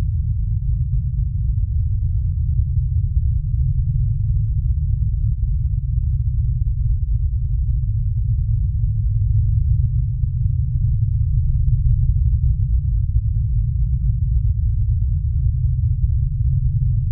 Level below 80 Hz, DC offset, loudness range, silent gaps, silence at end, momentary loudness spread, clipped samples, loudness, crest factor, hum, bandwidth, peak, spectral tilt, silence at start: -20 dBFS; under 0.1%; 2 LU; none; 0 s; 3 LU; under 0.1%; -21 LUFS; 12 dB; none; 0.3 kHz; -6 dBFS; -19 dB/octave; 0 s